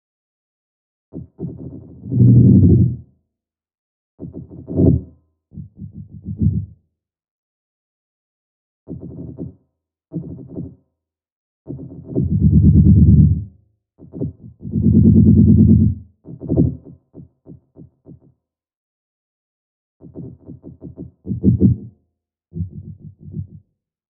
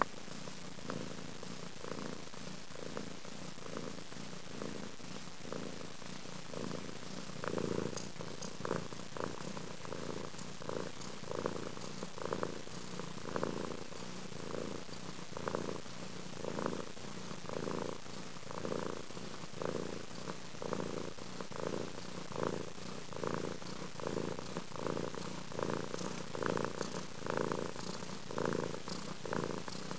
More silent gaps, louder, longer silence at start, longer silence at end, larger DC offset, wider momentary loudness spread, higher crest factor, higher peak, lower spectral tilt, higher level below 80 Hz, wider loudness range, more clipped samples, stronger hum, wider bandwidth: first, 3.78-4.18 s, 7.31-8.86 s, 11.32-11.65 s, 18.76-20.00 s vs none; first, -14 LUFS vs -43 LUFS; first, 1.15 s vs 0 s; first, 0.7 s vs 0 s; second, under 0.1% vs 0.6%; first, 26 LU vs 7 LU; second, 18 dB vs 30 dB; first, 0 dBFS vs -12 dBFS; first, -19.5 dB/octave vs -4.5 dB/octave; first, -30 dBFS vs -64 dBFS; first, 20 LU vs 6 LU; neither; neither; second, 1.1 kHz vs 8 kHz